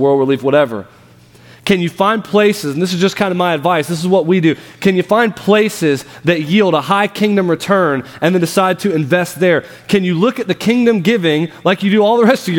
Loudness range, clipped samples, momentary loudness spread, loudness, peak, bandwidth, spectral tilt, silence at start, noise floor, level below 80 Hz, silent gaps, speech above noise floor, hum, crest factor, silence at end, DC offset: 2 LU; under 0.1%; 5 LU; -14 LUFS; 0 dBFS; 18 kHz; -6 dB/octave; 0 s; -43 dBFS; -56 dBFS; none; 30 dB; none; 14 dB; 0 s; under 0.1%